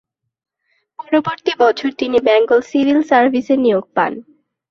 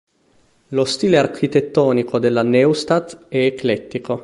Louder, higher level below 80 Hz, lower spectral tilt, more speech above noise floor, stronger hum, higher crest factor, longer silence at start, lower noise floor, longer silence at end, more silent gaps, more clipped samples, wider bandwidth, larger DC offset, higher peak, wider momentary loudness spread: first, -15 LUFS vs -18 LUFS; about the same, -60 dBFS vs -56 dBFS; about the same, -5.5 dB/octave vs -6 dB/octave; first, 52 dB vs 40 dB; neither; about the same, 14 dB vs 16 dB; first, 1 s vs 0.7 s; first, -66 dBFS vs -57 dBFS; first, 0.5 s vs 0 s; neither; neither; second, 7.2 kHz vs 11.5 kHz; neither; about the same, -2 dBFS vs -2 dBFS; about the same, 8 LU vs 8 LU